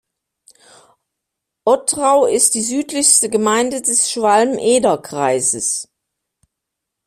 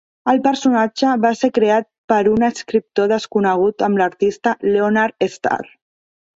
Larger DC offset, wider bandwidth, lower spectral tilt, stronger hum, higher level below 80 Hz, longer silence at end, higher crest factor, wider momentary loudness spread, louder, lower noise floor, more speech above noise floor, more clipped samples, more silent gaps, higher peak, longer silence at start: neither; first, 15.5 kHz vs 7.8 kHz; second, -2 dB/octave vs -5.5 dB/octave; neither; about the same, -60 dBFS vs -56 dBFS; first, 1.2 s vs 0.75 s; about the same, 18 dB vs 14 dB; about the same, 7 LU vs 5 LU; about the same, -15 LUFS vs -17 LUFS; second, -80 dBFS vs under -90 dBFS; second, 64 dB vs over 74 dB; neither; second, none vs 1.98-2.08 s; about the same, 0 dBFS vs -2 dBFS; first, 1.65 s vs 0.25 s